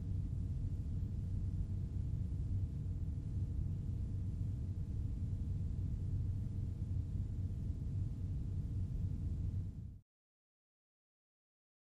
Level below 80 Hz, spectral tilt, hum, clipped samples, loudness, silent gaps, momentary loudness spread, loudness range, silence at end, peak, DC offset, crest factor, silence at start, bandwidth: -44 dBFS; -10 dB/octave; none; under 0.1%; -42 LUFS; none; 2 LU; 3 LU; 1.9 s; -28 dBFS; under 0.1%; 12 dB; 0 s; 7.6 kHz